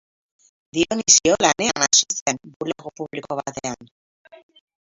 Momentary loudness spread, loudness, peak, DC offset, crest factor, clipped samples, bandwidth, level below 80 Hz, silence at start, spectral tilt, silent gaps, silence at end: 17 LU; -19 LUFS; 0 dBFS; under 0.1%; 22 dB; under 0.1%; 8 kHz; -56 dBFS; 0.75 s; -1 dB/octave; 2.21-2.26 s, 2.56-2.60 s; 1.1 s